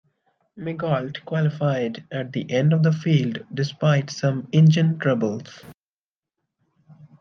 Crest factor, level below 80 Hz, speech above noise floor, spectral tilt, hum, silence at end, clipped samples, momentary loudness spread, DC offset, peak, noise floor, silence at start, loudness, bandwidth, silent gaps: 16 dB; -68 dBFS; over 69 dB; -7.5 dB/octave; none; 0.3 s; under 0.1%; 12 LU; under 0.1%; -6 dBFS; under -90 dBFS; 0.55 s; -22 LUFS; 6.8 kHz; 5.77-6.23 s